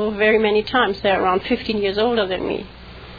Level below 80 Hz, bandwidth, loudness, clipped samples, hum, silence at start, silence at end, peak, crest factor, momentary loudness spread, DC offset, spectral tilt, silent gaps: -44 dBFS; 5 kHz; -19 LUFS; under 0.1%; none; 0 s; 0 s; -4 dBFS; 16 dB; 11 LU; under 0.1%; -7 dB/octave; none